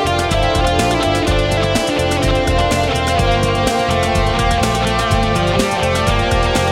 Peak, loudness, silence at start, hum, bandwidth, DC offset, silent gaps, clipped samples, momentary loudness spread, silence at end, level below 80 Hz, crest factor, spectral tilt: 0 dBFS; -15 LUFS; 0 s; none; 16.5 kHz; under 0.1%; none; under 0.1%; 1 LU; 0 s; -24 dBFS; 14 dB; -5 dB/octave